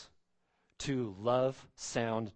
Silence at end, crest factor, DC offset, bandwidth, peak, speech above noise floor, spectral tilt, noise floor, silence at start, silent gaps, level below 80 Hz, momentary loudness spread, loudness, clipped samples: 0.05 s; 20 dB; under 0.1%; 8.8 kHz; -16 dBFS; 42 dB; -5 dB/octave; -76 dBFS; 0 s; none; -64 dBFS; 10 LU; -35 LUFS; under 0.1%